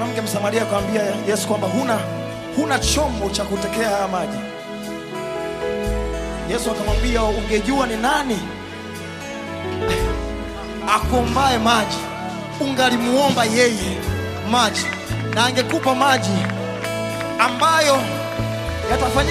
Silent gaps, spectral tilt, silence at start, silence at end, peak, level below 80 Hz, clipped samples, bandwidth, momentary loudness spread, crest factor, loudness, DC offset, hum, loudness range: none; -4 dB/octave; 0 s; 0 s; -2 dBFS; -32 dBFS; under 0.1%; 15 kHz; 12 LU; 18 dB; -20 LUFS; under 0.1%; none; 5 LU